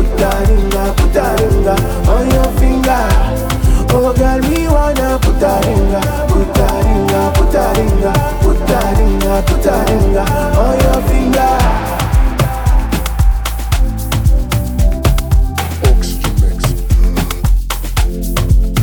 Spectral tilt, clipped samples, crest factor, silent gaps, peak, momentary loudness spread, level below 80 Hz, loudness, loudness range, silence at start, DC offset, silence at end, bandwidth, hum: -6 dB/octave; under 0.1%; 10 dB; none; 0 dBFS; 4 LU; -14 dBFS; -13 LUFS; 2 LU; 0 s; under 0.1%; 0 s; over 20 kHz; none